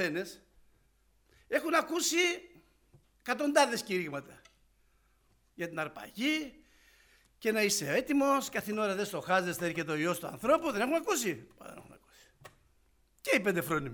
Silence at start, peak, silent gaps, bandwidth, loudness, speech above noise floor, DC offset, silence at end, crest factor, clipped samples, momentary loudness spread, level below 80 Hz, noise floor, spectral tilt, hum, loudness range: 0 s; -12 dBFS; none; over 20 kHz; -31 LUFS; 38 dB; under 0.1%; 0 s; 22 dB; under 0.1%; 14 LU; -68 dBFS; -69 dBFS; -3.5 dB/octave; none; 5 LU